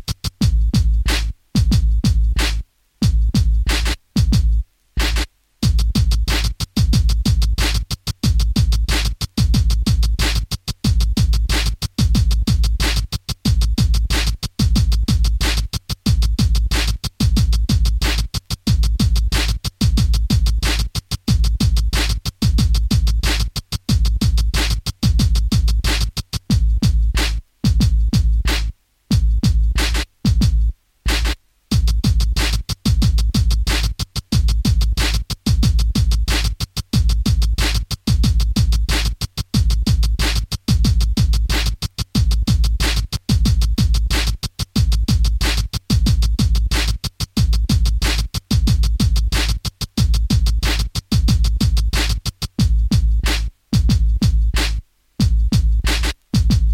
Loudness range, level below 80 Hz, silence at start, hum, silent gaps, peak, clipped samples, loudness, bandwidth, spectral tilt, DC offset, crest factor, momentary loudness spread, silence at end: 1 LU; -18 dBFS; 0.1 s; none; none; -4 dBFS; under 0.1%; -19 LUFS; 15.5 kHz; -4.5 dB/octave; under 0.1%; 12 dB; 5 LU; 0 s